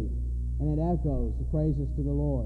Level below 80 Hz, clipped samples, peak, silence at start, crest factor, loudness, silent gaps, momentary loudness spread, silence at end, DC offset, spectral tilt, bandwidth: -30 dBFS; under 0.1%; -16 dBFS; 0 s; 12 dB; -30 LUFS; none; 5 LU; 0 s; under 0.1%; -12 dB/octave; 1.8 kHz